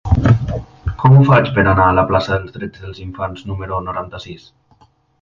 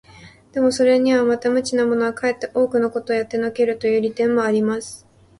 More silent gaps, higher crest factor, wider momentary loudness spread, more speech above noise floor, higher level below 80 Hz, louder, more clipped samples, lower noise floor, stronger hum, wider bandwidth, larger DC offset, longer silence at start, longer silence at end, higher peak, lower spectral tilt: neither; about the same, 16 dB vs 14 dB; first, 20 LU vs 7 LU; first, 38 dB vs 27 dB; first, -30 dBFS vs -58 dBFS; first, -15 LUFS vs -19 LUFS; neither; first, -53 dBFS vs -45 dBFS; neither; second, 7 kHz vs 11.5 kHz; neither; second, 0.05 s vs 0.2 s; first, 0.85 s vs 0.45 s; first, 0 dBFS vs -6 dBFS; first, -8.5 dB/octave vs -5 dB/octave